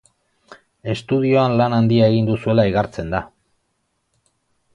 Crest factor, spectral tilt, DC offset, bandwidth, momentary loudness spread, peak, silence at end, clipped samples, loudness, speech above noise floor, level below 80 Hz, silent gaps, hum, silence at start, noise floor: 18 dB; -8 dB/octave; under 0.1%; 9.4 kHz; 11 LU; -2 dBFS; 1.5 s; under 0.1%; -18 LUFS; 53 dB; -46 dBFS; none; none; 0.5 s; -70 dBFS